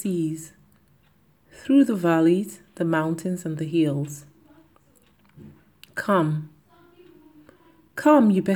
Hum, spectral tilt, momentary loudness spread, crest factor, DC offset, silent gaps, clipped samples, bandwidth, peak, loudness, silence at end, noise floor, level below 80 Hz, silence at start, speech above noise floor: none; -7 dB/octave; 19 LU; 20 dB; under 0.1%; none; under 0.1%; 19 kHz; -4 dBFS; -22 LUFS; 0 s; -61 dBFS; -68 dBFS; 0 s; 40 dB